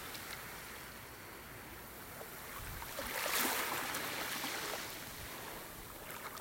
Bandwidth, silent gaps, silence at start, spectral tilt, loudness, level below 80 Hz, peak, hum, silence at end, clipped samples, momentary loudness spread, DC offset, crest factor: 16.5 kHz; none; 0 s; -1.5 dB/octave; -41 LUFS; -62 dBFS; -18 dBFS; none; 0 s; under 0.1%; 15 LU; under 0.1%; 26 dB